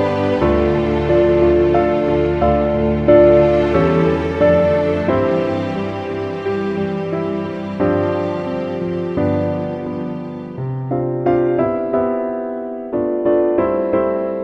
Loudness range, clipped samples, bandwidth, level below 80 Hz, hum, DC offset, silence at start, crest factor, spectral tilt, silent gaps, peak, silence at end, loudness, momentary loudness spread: 7 LU; under 0.1%; 6.6 kHz; -34 dBFS; none; under 0.1%; 0 s; 16 dB; -9 dB/octave; none; 0 dBFS; 0 s; -17 LUFS; 10 LU